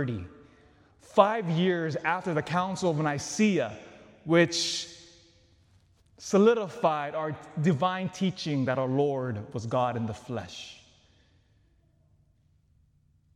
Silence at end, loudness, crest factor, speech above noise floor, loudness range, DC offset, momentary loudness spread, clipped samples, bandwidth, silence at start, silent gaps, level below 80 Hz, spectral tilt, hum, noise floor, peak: 2.6 s; -28 LUFS; 24 dB; 38 dB; 8 LU; under 0.1%; 14 LU; under 0.1%; 12.5 kHz; 0 s; none; -68 dBFS; -5.5 dB/octave; none; -65 dBFS; -4 dBFS